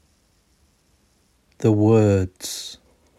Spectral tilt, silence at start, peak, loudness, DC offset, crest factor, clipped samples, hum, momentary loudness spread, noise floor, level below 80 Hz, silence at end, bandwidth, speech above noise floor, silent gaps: -6.5 dB/octave; 1.6 s; -6 dBFS; -20 LUFS; under 0.1%; 16 dB; under 0.1%; none; 15 LU; -62 dBFS; -56 dBFS; 0.45 s; 14 kHz; 44 dB; none